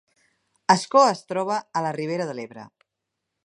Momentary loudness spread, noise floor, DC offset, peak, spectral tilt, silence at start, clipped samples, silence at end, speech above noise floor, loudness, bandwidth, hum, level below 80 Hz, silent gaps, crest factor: 13 LU; -82 dBFS; under 0.1%; -2 dBFS; -4.5 dB/octave; 0.7 s; under 0.1%; 0.8 s; 60 dB; -23 LUFS; 11.5 kHz; none; -78 dBFS; none; 22 dB